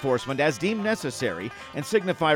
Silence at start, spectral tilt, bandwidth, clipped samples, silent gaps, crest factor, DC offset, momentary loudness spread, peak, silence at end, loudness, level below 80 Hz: 0 s; -5 dB/octave; 17.5 kHz; under 0.1%; none; 16 dB; under 0.1%; 11 LU; -8 dBFS; 0 s; -26 LUFS; -62 dBFS